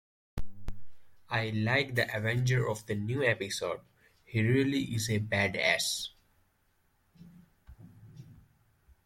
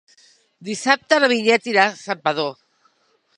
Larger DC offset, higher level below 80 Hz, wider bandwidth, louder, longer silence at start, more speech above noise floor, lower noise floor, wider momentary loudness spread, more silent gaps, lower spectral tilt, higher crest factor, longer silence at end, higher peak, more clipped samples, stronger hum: neither; first, -52 dBFS vs -72 dBFS; first, 16.5 kHz vs 11 kHz; second, -30 LUFS vs -18 LUFS; second, 0.35 s vs 0.6 s; second, 41 dB vs 45 dB; first, -72 dBFS vs -63 dBFS; first, 18 LU vs 12 LU; neither; first, -4.5 dB/octave vs -3 dB/octave; about the same, 22 dB vs 22 dB; second, 0.65 s vs 0.85 s; second, -12 dBFS vs 0 dBFS; neither; neither